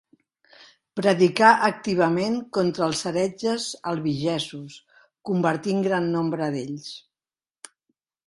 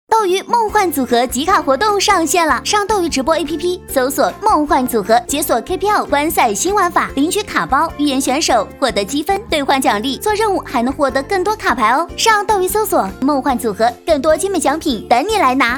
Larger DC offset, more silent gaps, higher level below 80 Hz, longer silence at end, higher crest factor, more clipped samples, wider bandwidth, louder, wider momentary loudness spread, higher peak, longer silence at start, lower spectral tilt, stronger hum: neither; neither; second, -66 dBFS vs -40 dBFS; first, 1.3 s vs 0 s; first, 22 dB vs 14 dB; neither; second, 11.5 kHz vs over 20 kHz; second, -23 LUFS vs -15 LUFS; first, 19 LU vs 4 LU; about the same, -2 dBFS vs 0 dBFS; first, 0.95 s vs 0.1 s; first, -5 dB/octave vs -3 dB/octave; neither